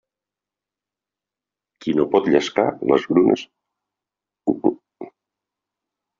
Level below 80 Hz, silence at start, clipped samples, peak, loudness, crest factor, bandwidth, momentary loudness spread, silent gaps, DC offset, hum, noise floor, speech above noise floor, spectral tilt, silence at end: -64 dBFS; 1.8 s; under 0.1%; -2 dBFS; -20 LUFS; 20 dB; 7.4 kHz; 20 LU; none; under 0.1%; none; -88 dBFS; 70 dB; -5 dB/octave; 1.1 s